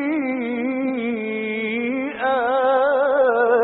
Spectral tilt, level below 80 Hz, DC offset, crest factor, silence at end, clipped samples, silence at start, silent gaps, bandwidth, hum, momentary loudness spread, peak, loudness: -3 dB/octave; -64 dBFS; under 0.1%; 14 dB; 0 s; under 0.1%; 0 s; none; 4.1 kHz; none; 7 LU; -6 dBFS; -21 LUFS